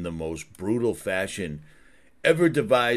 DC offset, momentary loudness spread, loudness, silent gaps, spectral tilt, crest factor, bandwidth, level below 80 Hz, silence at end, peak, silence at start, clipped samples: 0.2%; 13 LU; -25 LUFS; none; -5.5 dB/octave; 18 dB; 13.5 kHz; -54 dBFS; 0 s; -6 dBFS; 0 s; under 0.1%